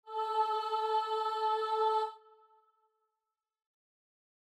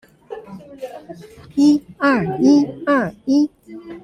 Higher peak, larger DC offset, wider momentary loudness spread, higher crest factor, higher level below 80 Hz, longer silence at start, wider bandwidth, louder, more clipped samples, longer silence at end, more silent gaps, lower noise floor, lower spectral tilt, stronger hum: second, -20 dBFS vs -4 dBFS; neither; second, 4 LU vs 23 LU; about the same, 16 dB vs 16 dB; second, under -90 dBFS vs -56 dBFS; second, 0.05 s vs 0.3 s; first, 12.5 kHz vs 9.6 kHz; second, -33 LUFS vs -17 LUFS; neither; first, 2.3 s vs 0.05 s; neither; first, -90 dBFS vs -36 dBFS; second, 0 dB/octave vs -6 dB/octave; neither